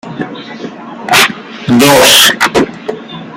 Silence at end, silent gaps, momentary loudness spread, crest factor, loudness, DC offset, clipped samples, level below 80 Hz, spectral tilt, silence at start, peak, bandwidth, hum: 0 s; none; 22 LU; 10 dB; -6 LUFS; under 0.1%; 0.7%; -44 dBFS; -2.5 dB/octave; 0.05 s; 0 dBFS; over 20 kHz; none